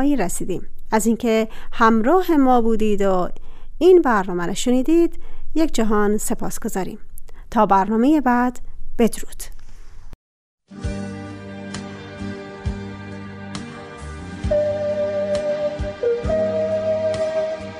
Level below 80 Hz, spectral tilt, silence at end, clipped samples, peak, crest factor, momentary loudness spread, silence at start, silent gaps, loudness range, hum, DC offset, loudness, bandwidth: -32 dBFS; -5.5 dB/octave; 0 s; under 0.1%; -2 dBFS; 18 dB; 18 LU; 0 s; 10.15-10.58 s; 14 LU; none; under 0.1%; -20 LUFS; 15.5 kHz